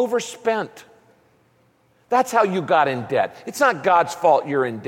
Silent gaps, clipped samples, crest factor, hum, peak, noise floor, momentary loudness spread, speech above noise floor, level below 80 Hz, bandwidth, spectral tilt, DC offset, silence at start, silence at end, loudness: none; under 0.1%; 16 dB; none; -4 dBFS; -60 dBFS; 6 LU; 40 dB; -68 dBFS; 17 kHz; -4.5 dB/octave; under 0.1%; 0 s; 0 s; -20 LUFS